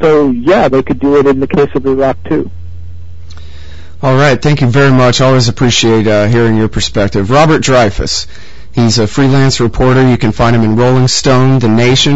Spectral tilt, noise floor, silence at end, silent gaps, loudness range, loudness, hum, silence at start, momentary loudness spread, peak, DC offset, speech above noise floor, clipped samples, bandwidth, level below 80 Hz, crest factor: -5.5 dB/octave; -31 dBFS; 0 s; none; 5 LU; -9 LUFS; none; 0 s; 7 LU; 0 dBFS; 8%; 22 dB; under 0.1%; 8 kHz; -28 dBFS; 10 dB